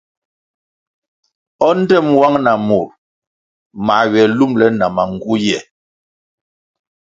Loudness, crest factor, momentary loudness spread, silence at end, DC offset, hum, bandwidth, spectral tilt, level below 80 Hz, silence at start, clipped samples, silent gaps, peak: -14 LUFS; 16 dB; 7 LU; 1.55 s; under 0.1%; none; 7.8 kHz; -6 dB/octave; -54 dBFS; 1.6 s; under 0.1%; 2.98-3.70 s; 0 dBFS